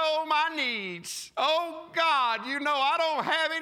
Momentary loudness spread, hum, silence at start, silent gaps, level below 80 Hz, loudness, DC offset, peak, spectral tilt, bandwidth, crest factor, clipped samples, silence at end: 8 LU; none; 0 s; none; -78 dBFS; -27 LUFS; under 0.1%; -14 dBFS; -2 dB/octave; 16 kHz; 14 dB; under 0.1%; 0 s